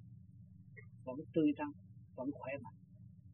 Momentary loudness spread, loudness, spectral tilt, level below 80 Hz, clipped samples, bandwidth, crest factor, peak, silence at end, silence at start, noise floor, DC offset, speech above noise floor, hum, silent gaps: 24 LU; -41 LUFS; -5.5 dB/octave; -76 dBFS; under 0.1%; 3.2 kHz; 20 dB; -22 dBFS; 0 s; 0 s; -58 dBFS; under 0.1%; 19 dB; none; none